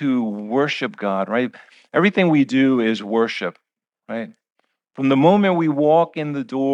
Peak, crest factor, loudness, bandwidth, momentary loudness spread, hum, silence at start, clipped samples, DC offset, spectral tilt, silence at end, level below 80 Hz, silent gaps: -2 dBFS; 16 dB; -19 LUFS; 8.2 kHz; 13 LU; none; 0 s; under 0.1%; under 0.1%; -7 dB/octave; 0 s; -74 dBFS; none